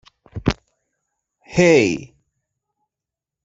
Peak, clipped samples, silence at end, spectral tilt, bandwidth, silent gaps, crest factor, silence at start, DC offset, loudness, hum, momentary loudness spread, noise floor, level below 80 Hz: -2 dBFS; under 0.1%; 1.4 s; -5.5 dB/octave; 8 kHz; none; 20 dB; 0.35 s; under 0.1%; -18 LUFS; none; 17 LU; -87 dBFS; -44 dBFS